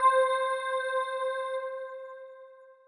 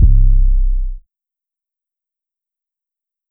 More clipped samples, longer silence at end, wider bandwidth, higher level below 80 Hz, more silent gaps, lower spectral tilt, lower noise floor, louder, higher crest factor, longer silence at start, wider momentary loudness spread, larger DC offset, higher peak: neither; second, 0.15 s vs 2.3 s; first, 10.5 kHz vs 0.4 kHz; second, -84 dBFS vs -14 dBFS; neither; second, 2 dB/octave vs -16 dB/octave; second, -52 dBFS vs -87 dBFS; second, -30 LUFS vs -17 LUFS; about the same, 16 dB vs 14 dB; about the same, 0 s vs 0 s; first, 20 LU vs 17 LU; neither; second, -14 dBFS vs -2 dBFS